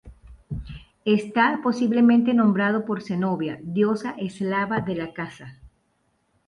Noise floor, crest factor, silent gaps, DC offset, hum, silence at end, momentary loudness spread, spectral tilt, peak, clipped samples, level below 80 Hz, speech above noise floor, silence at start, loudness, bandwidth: -69 dBFS; 16 dB; none; under 0.1%; none; 0.8 s; 18 LU; -7.5 dB/octave; -6 dBFS; under 0.1%; -50 dBFS; 47 dB; 0.05 s; -23 LUFS; 9.6 kHz